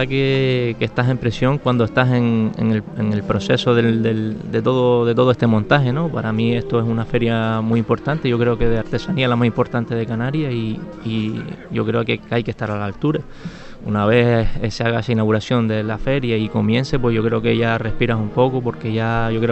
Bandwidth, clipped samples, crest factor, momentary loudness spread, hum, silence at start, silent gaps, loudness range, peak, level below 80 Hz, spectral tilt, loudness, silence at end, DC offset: 8.2 kHz; under 0.1%; 18 dB; 7 LU; none; 0 s; none; 4 LU; 0 dBFS; -36 dBFS; -7.5 dB/octave; -19 LUFS; 0 s; under 0.1%